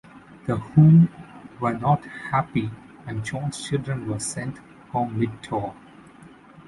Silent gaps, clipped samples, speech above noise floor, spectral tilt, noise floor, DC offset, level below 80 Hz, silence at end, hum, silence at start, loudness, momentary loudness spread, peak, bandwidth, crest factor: none; under 0.1%; 26 dB; -7 dB/octave; -48 dBFS; under 0.1%; -54 dBFS; 0.05 s; none; 0.15 s; -23 LUFS; 19 LU; -4 dBFS; 11.5 kHz; 20 dB